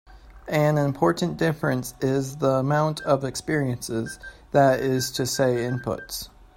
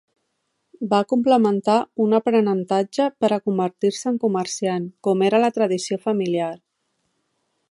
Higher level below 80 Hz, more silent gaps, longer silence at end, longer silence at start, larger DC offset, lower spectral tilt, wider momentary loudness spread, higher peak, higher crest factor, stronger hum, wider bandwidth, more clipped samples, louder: first, -52 dBFS vs -72 dBFS; neither; second, 0.3 s vs 1.15 s; second, 0.1 s vs 0.8 s; neither; about the same, -5.5 dB/octave vs -5.5 dB/octave; first, 10 LU vs 7 LU; about the same, -6 dBFS vs -4 dBFS; about the same, 18 dB vs 18 dB; neither; first, 16.5 kHz vs 11.5 kHz; neither; second, -24 LUFS vs -21 LUFS